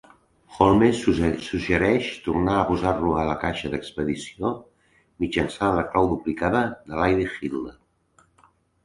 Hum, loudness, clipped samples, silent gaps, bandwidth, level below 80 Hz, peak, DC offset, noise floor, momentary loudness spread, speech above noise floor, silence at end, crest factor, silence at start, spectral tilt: none; -23 LUFS; under 0.1%; none; 11.5 kHz; -42 dBFS; -2 dBFS; under 0.1%; -61 dBFS; 10 LU; 39 dB; 1.15 s; 22 dB; 0.5 s; -6.5 dB/octave